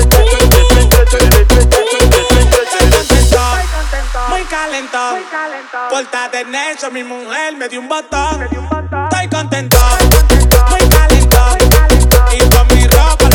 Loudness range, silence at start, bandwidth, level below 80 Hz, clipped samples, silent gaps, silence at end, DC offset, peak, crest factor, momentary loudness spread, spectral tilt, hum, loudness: 10 LU; 0 s; 20 kHz; -10 dBFS; 0.6%; none; 0 s; under 0.1%; 0 dBFS; 8 dB; 11 LU; -4.5 dB/octave; none; -10 LUFS